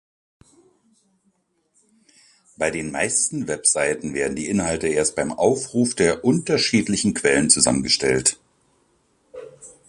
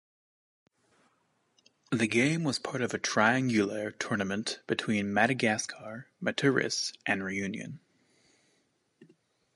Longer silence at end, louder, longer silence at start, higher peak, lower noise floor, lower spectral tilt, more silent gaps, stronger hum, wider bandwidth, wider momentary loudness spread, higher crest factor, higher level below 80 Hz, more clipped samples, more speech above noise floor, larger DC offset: second, 0.2 s vs 0.5 s; first, -20 LUFS vs -29 LUFS; first, 2.6 s vs 1.9 s; first, 0 dBFS vs -8 dBFS; second, -67 dBFS vs -73 dBFS; second, -3 dB/octave vs -4.5 dB/octave; neither; neither; about the same, 11.5 kHz vs 11.5 kHz; about the same, 9 LU vs 11 LU; about the same, 22 dB vs 22 dB; first, -50 dBFS vs -68 dBFS; neither; first, 47 dB vs 43 dB; neither